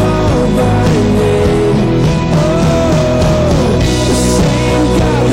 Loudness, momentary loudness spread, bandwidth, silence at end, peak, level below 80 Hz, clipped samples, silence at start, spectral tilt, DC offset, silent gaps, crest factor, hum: -11 LUFS; 1 LU; 16.5 kHz; 0 s; -6 dBFS; -20 dBFS; under 0.1%; 0 s; -6 dB/octave; under 0.1%; none; 4 dB; none